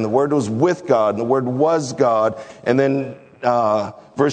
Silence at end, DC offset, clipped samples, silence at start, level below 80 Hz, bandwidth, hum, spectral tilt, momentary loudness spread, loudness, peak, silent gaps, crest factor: 0 s; under 0.1%; under 0.1%; 0 s; -64 dBFS; 9.4 kHz; none; -6.5 dB/octave; 7 LU; -19 LUFS; -2 dBFS; none; 16 dB